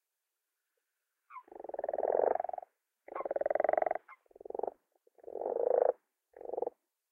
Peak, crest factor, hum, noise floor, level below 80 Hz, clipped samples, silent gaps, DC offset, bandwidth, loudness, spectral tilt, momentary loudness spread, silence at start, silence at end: -14 dBFS; 24 dB; none; -88 dBFS; -80 dBFS; under 0.1%; none; under 0.1%; 2.8 kHz; -35 LUFS; -7.5 dB/octave; 18 LU; 1.3 s; 0.4 s